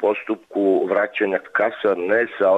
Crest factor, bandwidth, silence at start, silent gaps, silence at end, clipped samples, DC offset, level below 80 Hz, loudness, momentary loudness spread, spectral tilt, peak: 12 dB; 7.8 kHz; 0 s; none; 0 s; under 0.1%; under 0.1%; -68 dBFS; -20 LUFS; 4 LU; -7 dB/octave; -8 dBFS